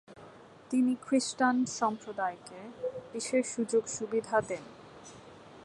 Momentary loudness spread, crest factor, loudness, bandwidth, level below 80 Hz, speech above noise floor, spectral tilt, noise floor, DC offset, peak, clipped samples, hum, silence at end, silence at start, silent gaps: 22 LU; 20 dB; -32 LUFS; 11.5 kHz; -72 dBFS; 22 dB; -3.5 dB/octave; -53 dBFS; under 0.1%; -14 dBFS; under 0.1%; none; 0 s; 0.1 s; none